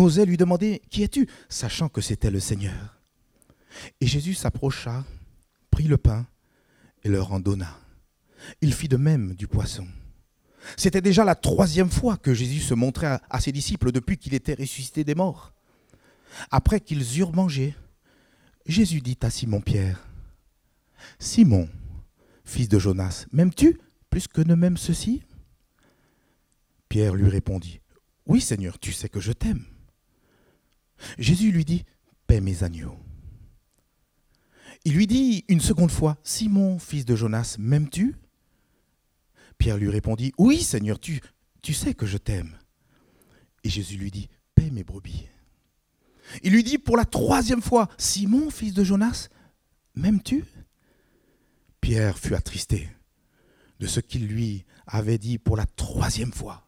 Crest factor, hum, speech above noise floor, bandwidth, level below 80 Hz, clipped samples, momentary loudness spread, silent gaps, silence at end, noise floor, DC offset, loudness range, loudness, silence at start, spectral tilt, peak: 24 dB; none; 46 dB; 16 kHz; -38 dBFS; under 0.1%; 15 LU; none; 0.1 s; -69 dBFS; under 0.1%; 6 LU; -24 LUFS; 0 s; -6 dB/octave; 0 dBFS